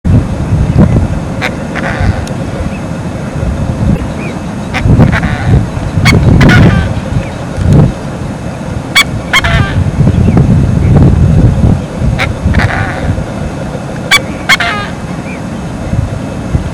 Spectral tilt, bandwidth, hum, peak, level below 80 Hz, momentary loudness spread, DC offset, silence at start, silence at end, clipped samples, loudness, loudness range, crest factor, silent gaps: -6 dB/octave; over 20 kHz; none; 0 dBFS; -18 dBFS; 12 LU; under 0.1%; 0.05 s; 0 s; 5%; -10 LUFS; 5 LU; 10 dB; none